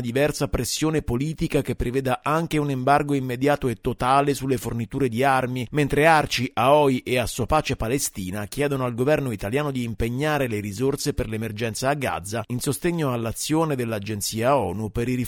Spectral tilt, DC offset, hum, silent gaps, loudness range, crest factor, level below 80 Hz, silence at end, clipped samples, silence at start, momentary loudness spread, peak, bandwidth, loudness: -5 dB/octave; under 0.1%; none; none; 5 LU; 20 dB; -40 dBFS; 0 s; under 0.1%; 0 s; 8 LU; -4 dBFS; 19.5 kHz; -23 LUFS